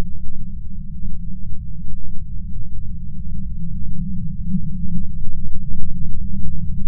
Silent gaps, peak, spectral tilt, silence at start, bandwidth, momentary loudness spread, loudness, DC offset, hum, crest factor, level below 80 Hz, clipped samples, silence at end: none; 0 dBFS; -24 dB/octave; 0 s; 0.2 kHz; 8 LU; -30 LUFS; under 0.1%; none; 12 dB; -26 dBFS; under 0.1%; 0 s